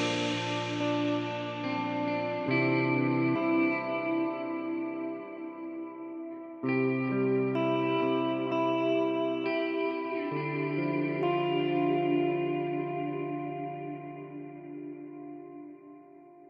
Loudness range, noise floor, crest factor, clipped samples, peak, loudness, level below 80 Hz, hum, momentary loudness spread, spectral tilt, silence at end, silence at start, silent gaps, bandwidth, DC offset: 5 LU; -53 dBFS; 14 dB; under 0.1%; -16 dBFS; -30 LUFS; -76 dBFS; none; 15 LU; -6.5 dB/octave; 0.05 s; 0 s; none; 8.6 kHz; under 0.1%